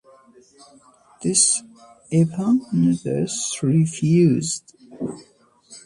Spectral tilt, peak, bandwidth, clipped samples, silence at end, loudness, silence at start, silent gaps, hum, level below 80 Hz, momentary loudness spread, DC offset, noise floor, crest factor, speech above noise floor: -5 dB/octave; -4 dBFS; 11.5 kHz; under 0.1%; 0.05 s; -20 LUFS; 1.2 s; none; none; -60 dBFS; 15 LU; under 0.1%; -52 dBFS; 18 dB; 33 dB